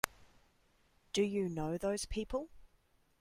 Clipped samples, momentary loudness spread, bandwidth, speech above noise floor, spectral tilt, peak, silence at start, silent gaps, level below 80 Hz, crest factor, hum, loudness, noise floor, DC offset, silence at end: under 0.1%; 7 LU; 16 kHz; 35 dB; -4.5 dB/octave; -10 dBFS; 0.05 s; none; -54 dBFS; 30 dB; none; -38 LUFS; -72 dBFS; under 0.1%; 0.55 s